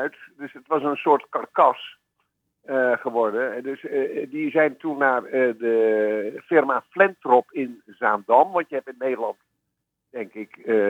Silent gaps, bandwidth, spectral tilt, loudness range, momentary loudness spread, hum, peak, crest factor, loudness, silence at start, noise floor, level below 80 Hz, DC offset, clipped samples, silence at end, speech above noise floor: none; 7.6 kHz; -7 dB/octave; 4 LU; 15 LU; none; -4 dBFS; 20 dB; -22 LUFS; 0 s; -79 dBFS; -86 dBFS; under 0.1%; under 0.1%; 0 s; 57 dB